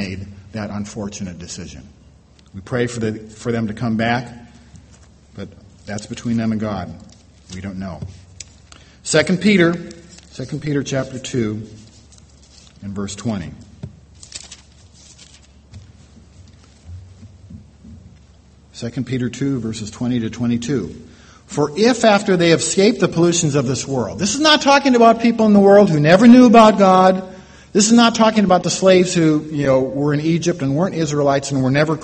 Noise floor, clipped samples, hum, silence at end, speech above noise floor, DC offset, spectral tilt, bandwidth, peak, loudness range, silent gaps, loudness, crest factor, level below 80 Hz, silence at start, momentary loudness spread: -48 dBFS; under 0.1%; none; 0 s; 32 dB; under 0.1%; -5 dB/octave; 8.8 kHz; 0 dBFS; 17 LU; none; -15 LUFS; 18 dB; -48 dBFS; 0 s; 23 LU